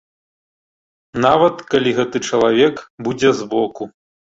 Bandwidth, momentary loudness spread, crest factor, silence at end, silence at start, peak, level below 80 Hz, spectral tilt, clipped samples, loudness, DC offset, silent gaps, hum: 8 kHz; 13 LU; 16 dB; 0.45 s; 1.15 s; -2 dBFS; -54 dBFS; -5 dB/octave; under 0.1%; -17 LUFS; under 0.1%; 2.90-2.98 s; none